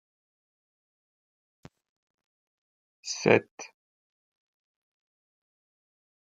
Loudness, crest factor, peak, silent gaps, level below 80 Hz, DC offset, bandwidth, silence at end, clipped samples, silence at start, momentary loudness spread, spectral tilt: -26 LUFS; 32 dB; -4 dBFS; 3.51-3.57 s; -76 dBFS; under 0.1%; 9.2 kHz; 2.6 s; under 0.1%; 3.05 s; 22 LU; -4.5 dB/octave